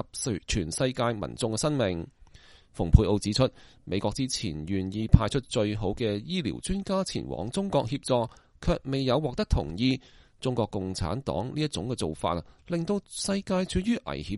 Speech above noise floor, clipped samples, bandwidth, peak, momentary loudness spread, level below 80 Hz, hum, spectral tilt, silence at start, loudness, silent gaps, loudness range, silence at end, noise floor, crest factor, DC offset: 26 dB; under 0.1%; 11.5 kHz; 0 dBFS; 9 LU; -38 dBFS; none; -5.5 dB/octave; 0 s; -29 LUFS; none; 4 LU; 0 s; -54 dBFS; 28 dB; under 0.1%